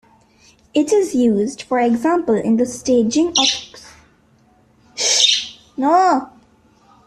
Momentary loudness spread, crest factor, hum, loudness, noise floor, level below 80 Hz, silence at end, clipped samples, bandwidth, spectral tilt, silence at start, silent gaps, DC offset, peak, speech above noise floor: 9 LU; 16 dB; none; -16 LUFS; -54 dBFS; -56 dBFS; 0.8 s; under 0.1%; 13.5 kHz; -2.5 dB/octave; 0.75 s; none; under 0.1%; -2 dBFS; 38 dB